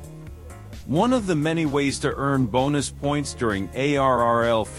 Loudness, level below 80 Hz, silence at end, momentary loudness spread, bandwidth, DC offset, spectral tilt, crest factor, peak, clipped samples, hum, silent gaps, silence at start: -22 LUFS; -42 dBFS; 0 s; 20 LU; 15 kHz; under 0.1%; -5.5 dB/octave; 16 dB; -8 dBFS; under 0.1%; none; none; 0 s